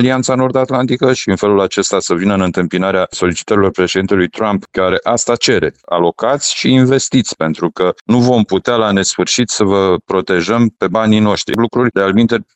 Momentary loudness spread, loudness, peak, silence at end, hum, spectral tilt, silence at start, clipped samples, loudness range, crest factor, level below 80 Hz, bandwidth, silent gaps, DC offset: 4 LU; -13 LUFS; 0 dBFS; 0.15 s; none; -4.5 dB/octave; 0 s; under 0.1%; 1 LU; 12 dB; -48 dBFS; 8.6 kHz; 8.01-8.05 s; under 0.1%